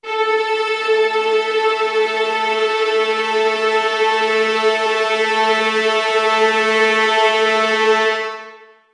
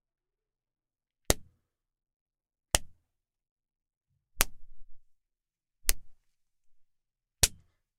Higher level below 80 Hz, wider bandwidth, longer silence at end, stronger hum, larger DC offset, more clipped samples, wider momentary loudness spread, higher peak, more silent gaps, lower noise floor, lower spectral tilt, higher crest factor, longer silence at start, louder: second, -76 dBFS vs -46 dBFS; second, 10.5 kHz vs 15.5 kHz; about the same, 0.35 s vs 0.45 s; neither; neither; neither; about the same, 4 LU vs 4 LU; about the same, -2 dBFS vs 0 dBFS; second, none vs 2.16-2.26 s, 3.51-3.56 s, 3.97-4.01 s; second, -41 dBFS vs -90 dBFS; about the same, -1.5 dB/octave vs -1.5 dB/octave; second, 16 dB vs 38 dB; second, 0.05 s vs 1.3 s; first, -16 LUFS vs -30 LUFS